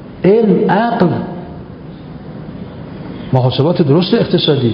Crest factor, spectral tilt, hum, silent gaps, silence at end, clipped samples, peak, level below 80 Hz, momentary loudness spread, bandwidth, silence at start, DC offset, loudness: 14 dB; -10 dB/octave; none; none; 0 s; under 0.1%; 0 dBFS; -42 dBFS; 19 LU; 5.4 kHz; 0 s; under 0.1%; -13 LUFS